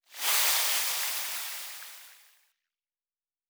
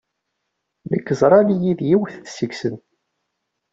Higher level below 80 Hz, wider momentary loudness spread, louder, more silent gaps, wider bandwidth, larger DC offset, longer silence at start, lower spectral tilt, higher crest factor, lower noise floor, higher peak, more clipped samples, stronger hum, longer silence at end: second, under -90 dBFS vs -60 dBFS; first, 19 LU vs 14 LU; second, -26 LUFS vs -19 LUFS; neither; first, over 20 kHz vs 7.8 kHz; neither; second, 0.1 s vs 0.9 s; second, 6 dB/octave vs -7.5 dB/octave; about the same, 20 dB vs 18 dB; first, under -90 dBFS vs -76 dBFS; second, -12 dBFS vs -2 dBFS; neither; neither; first, 1.35 s vs 0.95 s